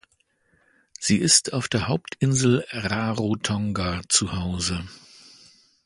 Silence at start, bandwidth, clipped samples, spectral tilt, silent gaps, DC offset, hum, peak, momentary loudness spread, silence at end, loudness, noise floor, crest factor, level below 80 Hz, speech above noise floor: 1 s; 11.5 kHz; under 0.1%; -3.5 dB/octave; none; under 0.1%; none; -4 dBFS; 10 LU; 0.9 s; -23 LUFS; -67 dBFS; 22 dB; -46 dBFS; 43 dB